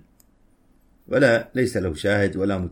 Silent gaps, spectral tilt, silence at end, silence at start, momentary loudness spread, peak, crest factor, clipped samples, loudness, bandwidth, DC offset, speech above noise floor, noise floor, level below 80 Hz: none; -6 dB/octave; 0 s; 1.1 s; 6 LU; -4 dBFS; 20 dB; under 0.1%; -21 LUFS; 16.5 kHz; under 0.1%; 37 dB; -58 dBFS; -48 dBFS